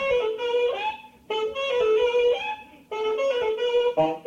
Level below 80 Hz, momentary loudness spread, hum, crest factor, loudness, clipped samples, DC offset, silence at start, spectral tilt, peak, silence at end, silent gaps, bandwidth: -58 dBFS; 10 LU; none; 14 dB; -24 LUFS; under 0.1%; under 0.1%; 0 s; -4 dB/octave; -12 dBFS; 0.05 s; none; 7.4 kHz